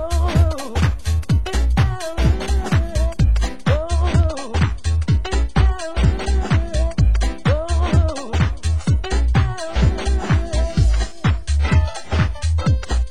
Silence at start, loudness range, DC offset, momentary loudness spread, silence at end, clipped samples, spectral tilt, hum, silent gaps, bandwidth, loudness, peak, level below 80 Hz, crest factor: 0 s; 0 LU; 3%; 3 LU; 0 s; under 0.1%; -6 dB/octave; none; none; 12 kHz; -20 LUFS; -2 dBFS; -20 dBFS; 14 dB